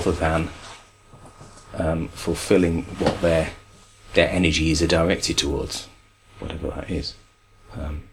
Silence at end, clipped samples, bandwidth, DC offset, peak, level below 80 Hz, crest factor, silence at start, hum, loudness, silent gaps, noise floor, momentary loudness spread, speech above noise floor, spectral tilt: 0.1 s; under 0.1%; 16 kHz; under 0.1%; -2 dBFS; -36 dBFS; 22 dB; 0 s; none; -23 LUFS; none; -51 dBFS; 16 LU; 29 dB; -4.5 dB/octave